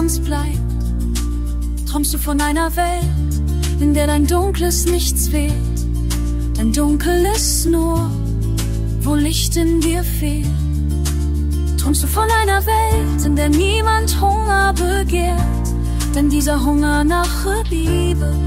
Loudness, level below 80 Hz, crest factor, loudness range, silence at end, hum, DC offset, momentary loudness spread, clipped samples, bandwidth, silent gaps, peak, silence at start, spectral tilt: -17 LUFS; -20 dBFS; 12 dB; 3 LU; 0 s; none; under 0.1%; 5 LU; under 0.1%; 16.5 kHz; none; -4 dBFS; 0 s; -5 dB/octave